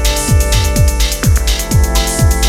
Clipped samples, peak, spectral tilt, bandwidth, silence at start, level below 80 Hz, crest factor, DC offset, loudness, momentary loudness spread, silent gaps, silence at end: under 0.1%; 0 dBFS; -4 dB/octave; 17 kHz; 0 s; -14 dBFS; 10 dB; under 0.1%; -13 LUFS; 2 LU; none; 0 s